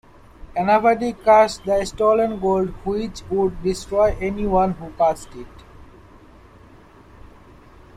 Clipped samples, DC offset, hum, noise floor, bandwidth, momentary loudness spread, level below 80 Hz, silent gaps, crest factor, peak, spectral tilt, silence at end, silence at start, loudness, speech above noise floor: under 0.1%; under 0.1%; none; -47 dBFS; 13 kHz; 11 LU; -40 dBFS; none; 18 dB; -4 dBFS; -6 dB/octave; 0.7 s; 0.4 s; -20 LUFS; 28 dB